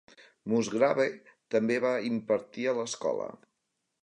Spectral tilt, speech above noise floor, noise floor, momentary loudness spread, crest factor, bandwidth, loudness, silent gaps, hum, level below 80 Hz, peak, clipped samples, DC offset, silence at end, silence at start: -5 dB/octave; 53 dB; -82 dBFS; 10 LU; 20 dB; 10 kHz; -30 LUFS; none; none; -78 dBFS; -12 dBFS; under 0.1%; under 0.1%; 0.7 s; 0.45 s